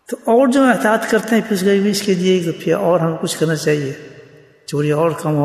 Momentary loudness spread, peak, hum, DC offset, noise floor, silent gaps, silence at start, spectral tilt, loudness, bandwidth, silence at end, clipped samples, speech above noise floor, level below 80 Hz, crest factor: 7 LU; -2 dBFS; none; under 0.1%; -44 dBFS; none; 0.1 s; -5.5 dB/octave; -16 LUFS; 14 kHz; 0 s; under 0.1%; 28 dB; -62 dBFS; 14 dB